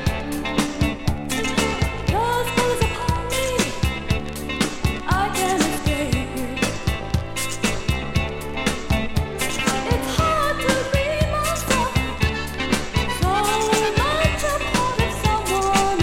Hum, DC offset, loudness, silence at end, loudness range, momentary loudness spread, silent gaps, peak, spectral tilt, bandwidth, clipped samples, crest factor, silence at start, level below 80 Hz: none; under 0.1%; -22 LUFS; 0 s; 3 LU; 6 LU; none; -4 dBFS; -4.5 dB/octave; 17 kHz; under 0.1%; 18 dB; 0 s; -30 dBFS